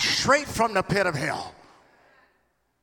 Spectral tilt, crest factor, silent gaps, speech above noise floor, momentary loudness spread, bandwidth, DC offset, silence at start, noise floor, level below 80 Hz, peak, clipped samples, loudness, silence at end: -3.5 dB/octave; 20 dB; none; 46 dB; 12 LU; 18 kHz; under 0.1%; 0 s; -70 dBFS; -54 dBFS; -6 dBFS; under 0.1%; -24 LUFS; 1.3 s